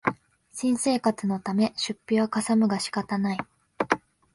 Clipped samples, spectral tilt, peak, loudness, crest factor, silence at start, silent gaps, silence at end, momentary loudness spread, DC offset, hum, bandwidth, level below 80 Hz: under 0.1%; -4.5 dB/octave; -4 dBFS; -26 LUFS; 22 dB; 0.05 s; none; 0.35 s; 10 LU; under 0.1%; none; 11.5 kHz; -66 dBFS